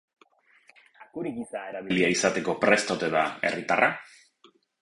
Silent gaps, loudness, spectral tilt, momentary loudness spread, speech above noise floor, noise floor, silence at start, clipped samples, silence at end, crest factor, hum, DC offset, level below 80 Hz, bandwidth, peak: none; -26 LUFS; -3.5 dB/octave; 13 LU; 36 dB; -62 dBFS; 1 s; under 0.1%; 0.75 s; 22 dB; none; under 0.1%; -66 dBFS; 11.5 kHz; -6 dBFS